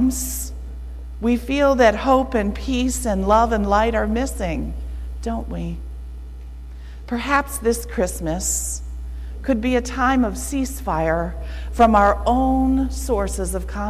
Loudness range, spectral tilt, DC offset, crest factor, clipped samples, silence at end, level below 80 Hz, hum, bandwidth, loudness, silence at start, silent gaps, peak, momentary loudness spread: 7 LU; -5 dB/octave; under 0.1%; 16 dB; under 0.1%; 0 s; -28 dBFS; none; 15.5 kHz; -20 LUFS; 0 s; none; -4 dBFS; 18 LU